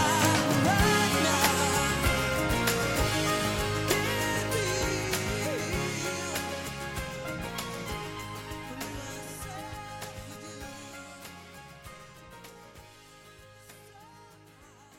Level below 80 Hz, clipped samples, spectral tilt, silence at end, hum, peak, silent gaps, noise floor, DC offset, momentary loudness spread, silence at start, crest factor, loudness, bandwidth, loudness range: -44 dBFS; under 0.1%; -3.5 dB/octave; 0 s; none; -10 dBFS; none; -54 dBFS; under 0.1%; 22 LU; 0 s; 20 dB; -28 LUFS; 17 kHz; 21 LU